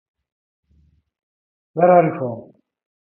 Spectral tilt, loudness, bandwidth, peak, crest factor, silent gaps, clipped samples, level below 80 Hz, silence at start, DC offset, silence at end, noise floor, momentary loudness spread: -13 dB/octave; -17 LUFS; 3 kHz; -2 dBFS; 20 dB; none; under 0.1%; -66 dBFS; 1.75 s; under 0.1%; 0.75 s; -59 dBFS; 18 LU